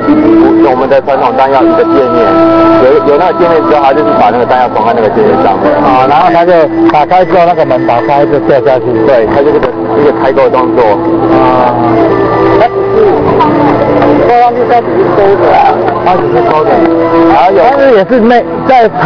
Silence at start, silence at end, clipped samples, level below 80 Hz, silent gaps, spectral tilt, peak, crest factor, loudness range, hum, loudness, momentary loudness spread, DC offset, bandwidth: 0 s; 0 s; 5%; -34 dBFS; none; -8 dB/octave; 0 dBFS; 6 dB; 1 LU; none; -6 LUFS; 3 LU; under 0.1%; 5.4 kHz